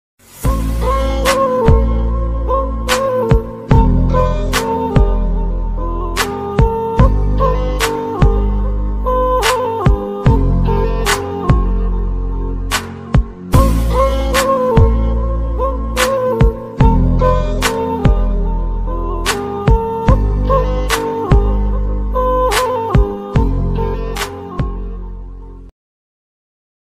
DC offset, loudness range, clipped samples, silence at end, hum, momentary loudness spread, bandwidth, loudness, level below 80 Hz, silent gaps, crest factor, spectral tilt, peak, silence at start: under 0.1%; 2 LU; under 0.1%; 1.1 s; none; 8 LU; 15.5 kHz; -16 LUFS; -16 dBFS; none; 14 dB; -6 dB/octave; 0 dBFS; 0.35 s